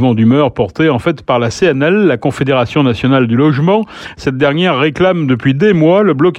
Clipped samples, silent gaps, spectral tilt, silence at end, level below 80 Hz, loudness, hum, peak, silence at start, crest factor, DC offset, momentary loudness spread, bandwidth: under 0.1%; none; -7 dB/octave; 0 s; -44 dBFS; -12 LUFS; none; 0 dBFS; 0 s; 10 dB; under 0.1%; 5 LU; 10.5 kHz